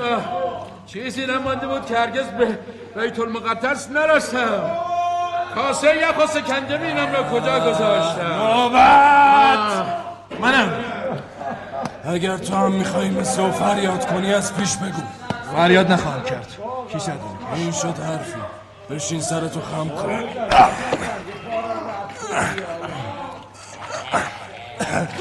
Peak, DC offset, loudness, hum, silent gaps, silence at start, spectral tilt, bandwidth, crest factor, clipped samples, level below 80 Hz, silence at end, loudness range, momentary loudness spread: -2 dBFS; under 0.1%; -20 LUFS; none; none; 0 s; -4.5 dB/octave; 12.5 kHz; 18 dB; under 0.1%; -50 dBFS; 0 s; 11 LU; 16 LU